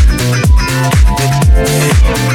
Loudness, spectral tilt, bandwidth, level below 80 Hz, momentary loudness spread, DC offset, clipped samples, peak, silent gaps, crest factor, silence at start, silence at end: -10 LUFS; -5 dB/octave; 17 kHz; -12 dBFS; 1 LU; under 0.1%; under 0.1%; 0 dBFS; none; 8 dB; 0 s; 0 s